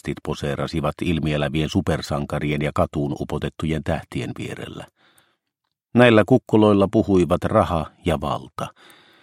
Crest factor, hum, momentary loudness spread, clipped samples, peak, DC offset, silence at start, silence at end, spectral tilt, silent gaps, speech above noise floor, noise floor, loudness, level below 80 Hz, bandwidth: 20 dB; none; 14 LU; under 0.1%; -2 dBFS; under 0.1%; 0.05 s; 0.55 s; -7 dB/octave; none; 59 dB; -79 dBFS; -21 LUFS; -42 dBFS; 15.5 kHz